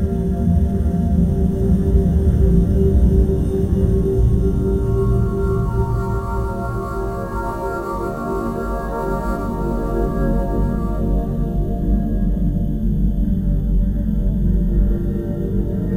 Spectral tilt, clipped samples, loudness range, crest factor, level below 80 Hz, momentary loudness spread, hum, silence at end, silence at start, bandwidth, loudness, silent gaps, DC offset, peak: -10 dB/octave; under 0.1%; 6 LU; 14 dB; -20 dBFS; 8 LU; none; 0 s; 0 s; 15.5 kHz; -20 LUFS; none; under 0.1%; -2 dBFS